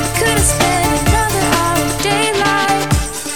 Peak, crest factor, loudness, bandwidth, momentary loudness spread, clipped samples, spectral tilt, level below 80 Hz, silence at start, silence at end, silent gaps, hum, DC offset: 0 dBFS; 14 dB; -14 LUFS; 19.5 kHz; 3 LU; under 0.1%; -3.5 dB/octave; -26 dBFS; 0 s; 0 s; none; none; 2%